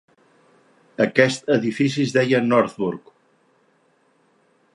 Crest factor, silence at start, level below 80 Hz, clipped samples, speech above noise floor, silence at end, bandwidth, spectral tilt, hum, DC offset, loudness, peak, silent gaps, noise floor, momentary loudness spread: 22 dB; 1 s; -68 dBFS; under 0.1%; 43 dB; 1.75 s; 11.5 kHz; -5.5 dB/octave; none; under 0.1%; -20 LUFS; 0 dBFS; none; -62 dBFS; 10 LU